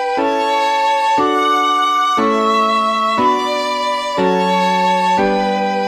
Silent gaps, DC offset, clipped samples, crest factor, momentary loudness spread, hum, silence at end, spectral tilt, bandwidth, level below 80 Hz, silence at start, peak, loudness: none; under 0.1%; under 0.1%; 12 dB; 3 LU; none; 0 s; -4.5 dB/octave; 14.5 kHz; -52 dBFS; 0 s; -2 dBFS; -15 LUFS